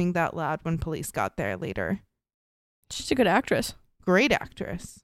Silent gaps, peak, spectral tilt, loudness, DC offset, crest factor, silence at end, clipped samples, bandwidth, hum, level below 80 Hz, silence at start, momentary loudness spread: 2.34-2.83 s; -8 dBFS; -5 dB/octave; -27 LUFS; under 0.1%; 20 dB; 0.1 s; under 0.1%; 15.5 kHz; none; -48 dBFS; 0 s; 13 LU